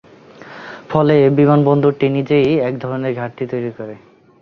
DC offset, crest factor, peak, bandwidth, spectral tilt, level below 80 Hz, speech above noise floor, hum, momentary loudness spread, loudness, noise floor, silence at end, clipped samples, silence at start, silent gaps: under 0.1%; 14 dB; -2 dBFS; 6.4 kHz; -9.5 dB/octave; -54 dBFS; 25 dB; none; 20 LU; -15 LUFS; -39 dBFS; 0.45 s; under 0.1%; 0.4 s; none